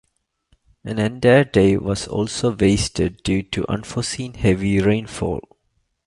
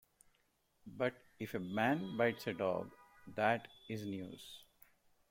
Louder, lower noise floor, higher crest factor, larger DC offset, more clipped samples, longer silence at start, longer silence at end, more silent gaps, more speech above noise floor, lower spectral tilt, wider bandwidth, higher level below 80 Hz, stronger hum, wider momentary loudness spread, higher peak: first, -20 LUFS vs -39 LUFS; second, -69 dBFS vs -78 dBFS; second, 18 dB vs 24 dB; neither; neither; about the same, 0.85 s vs 0.85 s; about the same, 0.65 s vs 0.65 s; neither; first, 50 dB vs 39 dB; about the same, -5.5 dB/octave vs -6 dB/octave; second, 11.5 kHz vs 16.5 kHz; first, -38 dBFS vs -76 dBFS; neither; second, 11 LU vs 18 LU; first, -2 dBFS vs -18 dBFS